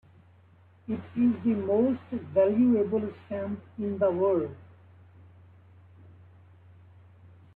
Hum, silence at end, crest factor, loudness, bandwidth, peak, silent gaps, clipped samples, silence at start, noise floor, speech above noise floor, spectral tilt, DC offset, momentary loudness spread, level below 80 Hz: none; 2.9 s; 18 dB; -27 LUFS; 3.9 kHz; -12 dBFS; none; under 0.1%; 0.9 s; -58 dBFS; 31 dB; -11.5 dB/octave; under 0.1%; 13 LU; -66 dBFS